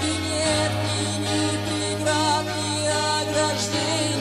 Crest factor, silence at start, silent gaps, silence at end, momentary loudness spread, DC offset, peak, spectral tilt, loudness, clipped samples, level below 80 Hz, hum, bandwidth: 14 dB; 0 s; none; 0 s; 3 LU; under 0.1%; -10 dBFS; -3.5 dB/octave; -23 LUFS; under 0.1%; -50 dBFS; none; 14.5 kHz